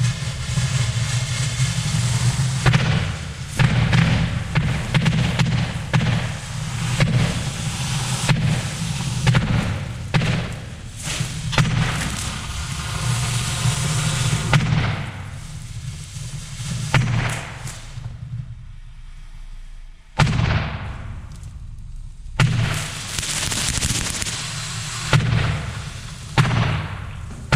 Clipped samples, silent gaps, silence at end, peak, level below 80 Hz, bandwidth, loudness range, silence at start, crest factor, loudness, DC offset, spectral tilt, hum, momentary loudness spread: under 0.1%; none; 0 s; 0 dBFS; -34 dBFS; 15 kHz; 6 LU; 0 s; 20 dB; -22 LUFS; under 0.1%; -4.5 dB/octave; none; 15 LU